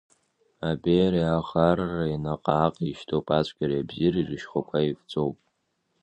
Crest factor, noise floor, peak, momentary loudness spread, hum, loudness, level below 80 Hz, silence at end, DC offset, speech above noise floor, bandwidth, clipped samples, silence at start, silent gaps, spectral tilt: 22 dB; -75 dBFS; -6 dBFS; 8 LU; none; -26 LUFS; -50 dBFS; 0.7 s; under 0.1%; 49 dB; 8.4 kHz; under 0.1%; 0.6 s; none; -8 dB/octave